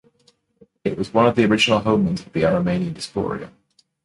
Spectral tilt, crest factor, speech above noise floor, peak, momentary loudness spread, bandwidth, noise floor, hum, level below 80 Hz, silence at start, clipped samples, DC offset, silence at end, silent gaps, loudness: -5.5 dB/octave; 18 dB; 42 dB; -2 dBFS; 11 LU; 11.5 kHz; -61 dBFS; none; -48 dBFS; 0.85 s; under 0.1%; under 0.1%; 0.55 s; none; -20 LUFS